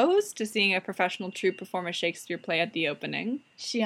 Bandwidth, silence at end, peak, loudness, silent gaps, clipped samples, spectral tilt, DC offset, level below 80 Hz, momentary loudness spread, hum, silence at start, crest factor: 16 kHz; 0 s; -10 dBFS; -29 LUFS; none; under 0.1%; -3.5 dB/octave; under 0.1%; -86 dBFS; 9 LU; none; 0 s; 18 dB